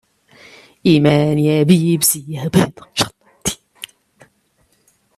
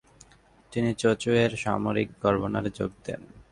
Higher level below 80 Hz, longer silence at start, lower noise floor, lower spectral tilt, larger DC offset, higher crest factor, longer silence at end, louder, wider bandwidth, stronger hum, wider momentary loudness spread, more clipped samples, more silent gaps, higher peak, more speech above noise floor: about the same, -50 dBFS vs -52 dBFS; first, 0.85 s vs 0.7 s; about the same, -61 dBFS vs -58 dBFS; about the same, -5 dB/octave vs -6 dB/octave; neither; about the same, 18 dB vs 20 dB; first, 1.3 s vs 0.1 s; first, -16 LUFS vs -27 LUFS; first, 16 kHz vs 11.5 kHz; neither; first, 17 LU vs 13 LU; neither; neither; first, 0 dBFS vs -8 dBFS; first, 47 dB vs 31 dB